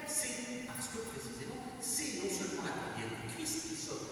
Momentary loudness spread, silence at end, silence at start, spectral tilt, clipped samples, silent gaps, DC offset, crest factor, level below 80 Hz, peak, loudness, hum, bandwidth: 8 LU; 0 s; 0 s; -2.5 dB/octave; under 0.1%; none; under 0.1%; 20 dB; -66 dBFS; -20 dBFS; -39 LUFS; none; over 20 kHz